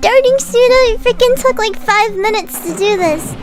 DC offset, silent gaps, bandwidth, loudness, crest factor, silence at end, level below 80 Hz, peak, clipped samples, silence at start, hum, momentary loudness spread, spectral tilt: under 0.1%; none; 16.5 kHz; -12 LUFS; 12 dB; 0 s; -30 dBFS; 0 dBFS; 0.3%; 0 s; none; 7 LU; -3 dB/octave